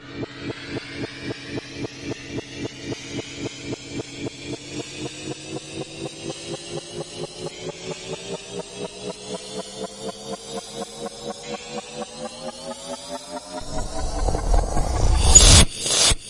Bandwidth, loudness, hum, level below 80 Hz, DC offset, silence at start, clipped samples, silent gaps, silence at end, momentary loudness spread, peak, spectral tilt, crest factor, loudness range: 12 kHz; -24 LUFS; none; -28 dBFS; under 0.1%; 0 s; under 0.1%; none; 0 s; 15 LU; 0 dBFS; -2.5 dB/octave; 24 dB; 14 LU